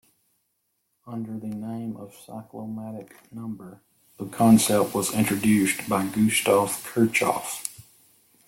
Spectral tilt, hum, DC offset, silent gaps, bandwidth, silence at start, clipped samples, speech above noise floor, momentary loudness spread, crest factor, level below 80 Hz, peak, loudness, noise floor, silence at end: -4.5 dB/octave; none; under 0.1%; none; 17 kHz; 1.05 s; under 0.1%; 51 dB; 21 LU; 20 dB; -60 dBFS; -6 dBFS; -23 LUFS; -75 dBFS; 0.65 s